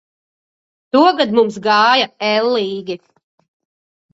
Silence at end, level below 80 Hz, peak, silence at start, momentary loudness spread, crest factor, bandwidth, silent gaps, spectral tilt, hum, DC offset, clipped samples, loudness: 1.2 s; -64 dBFS; 0 dBFS; 0.95 s; 13 LU; 16 dB; 8 kHz; none; -4.5 dB/octave; none; under 0.1%; under 0.1%; -14 LUFS